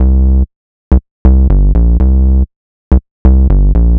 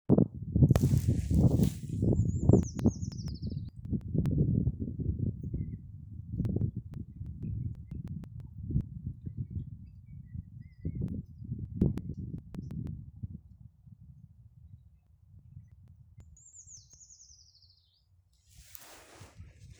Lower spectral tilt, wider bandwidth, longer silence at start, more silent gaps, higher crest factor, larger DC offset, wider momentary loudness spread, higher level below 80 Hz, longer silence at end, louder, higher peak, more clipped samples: first, -12.5 dB/octave vs -8.5 dB/octave; second, 1.9 kHz vs over 20 kHz; about the same, 0 s vs 0.1 s; first, 0.56-0.91 s, 1.11-1.25 s, 2.56-2.91 s, 3.11-3.25 s vs none; second, 8 dB vs 24 dB; neither; second, 5 LU vs 24 LU; first, -8 dBFS vs -44 dBFS; second, 0 s vs 0.15 s; first, -11 LUFS vs -32 LUFS; first, 0 dBFS vs -8 dBFS; neither